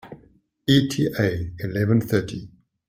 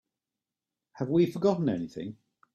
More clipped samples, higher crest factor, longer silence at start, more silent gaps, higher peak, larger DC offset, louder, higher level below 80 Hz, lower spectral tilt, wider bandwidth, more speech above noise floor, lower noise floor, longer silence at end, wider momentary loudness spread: neither; about the same, 20 dB vs 18 dB; second, 0.05 s vs 0.95 s; neither; first, -4 dBFS vs -14 dBFS; neither; first, -22 LUFS vs -28 LUFS; first, -50 dBFS vs -68 dBFS; second, -6.5 dB/octave vs -8.5 dB/octave; first, 16 kHz vs 13 kHz; second, 35 dB vs 62 dB; second, -57 dBFS vs -90 dBFS; about the same, 0.4 s vs 0.4 s; about the same, 12 LU vs 14 LU